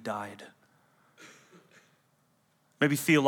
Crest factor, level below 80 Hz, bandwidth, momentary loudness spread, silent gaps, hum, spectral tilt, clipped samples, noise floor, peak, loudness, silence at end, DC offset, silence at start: 24 dB; -88 dBFS; 18.5 kHz; 27 LU; none; none; -5 dB/octave; under 0.1%; -70 dBFS; -8 dBFS; -29 LUFS; 0 s; under 0.1%; 0.05 s